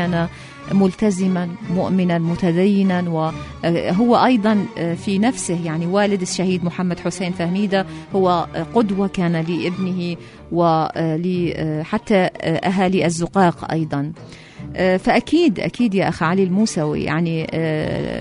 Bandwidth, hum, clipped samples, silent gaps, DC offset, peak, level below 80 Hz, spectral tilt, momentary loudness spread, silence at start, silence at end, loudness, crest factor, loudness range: 11 kHz; none; under 0.1%; none; under 0.1%; -2 dBFS; -46 dBFS; -6.5 dB/octave; 7 LU; 0 s; 0 s; -19 LUFS; 16 dB; 2 LU